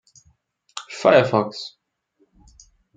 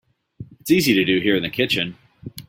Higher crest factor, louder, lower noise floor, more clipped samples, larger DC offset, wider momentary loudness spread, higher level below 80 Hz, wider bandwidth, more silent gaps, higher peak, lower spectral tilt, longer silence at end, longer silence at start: about the same, 22 dB vs 18 dB; about the same, -18 LUFS vs -19 LUFS; first, -66 dBFS vs -41 dBFS; neither; neither; about the same, 21 LU vs 19 LU; second, -62 dBFS vs -54 dBFS; second, 9.4 kHz vs 16.5 kHz; neither; about the same, -2 dBFS vs -4 dBFS; about the same, -5.5 dB/octave vs -4.5 dB/octave; first, 1.3 s vs 0.05 s; first, 0.75 s vs 0.4 s